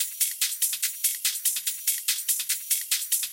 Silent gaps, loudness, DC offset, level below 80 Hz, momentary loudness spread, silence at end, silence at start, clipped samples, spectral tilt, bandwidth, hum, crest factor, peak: none; -24 LUFS; under 0.1%; under -90 dBFS; 1 LU; 0 s; 0 s; under 0.1%; 6.5 dB/octave; 17 kHz; none; 18 dB; -8 dBFS